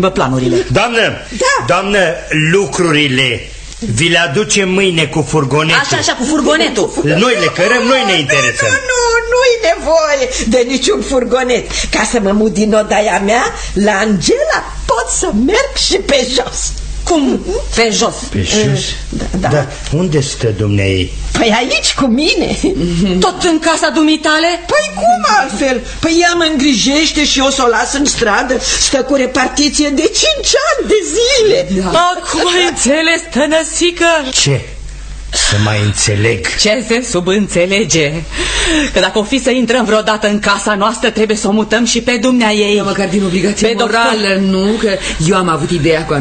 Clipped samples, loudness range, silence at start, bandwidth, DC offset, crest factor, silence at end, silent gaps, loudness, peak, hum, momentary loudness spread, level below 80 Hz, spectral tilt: under 0.1%; 2 LU; 0 s; 9.4 kHz; under 0.1%; 12 dB; 0 s; none; -11 LUFS; 0 dBFS; none; 5 LU; -28 dBFS; -3.5 dB/octave